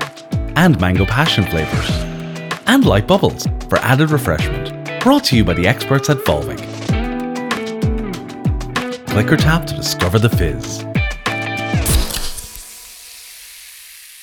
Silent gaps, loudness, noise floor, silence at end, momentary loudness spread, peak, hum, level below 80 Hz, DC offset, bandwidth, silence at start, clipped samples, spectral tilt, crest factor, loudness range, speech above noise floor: none; -16 LUFS; -38 dBFS; 0 s; 19 LU; 0 dBFS; none; -28 dBFS; under 0.1%; over 20 kHz; 0 s; under 0.1%; -5 dB/octave; 16 dB; 5 LU; 24 dB